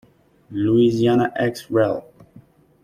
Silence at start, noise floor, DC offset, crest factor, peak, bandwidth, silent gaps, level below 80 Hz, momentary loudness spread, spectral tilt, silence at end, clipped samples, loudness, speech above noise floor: 0.5 s; -50 dBFS; under 0.1%; 16 dB; -6 dBFS; 14.5 kHz; none; -56 dBFS; 10 LU; -7.5 dB/octave; 0.8 s; under 0.1%; -19 LUFS; 31 dB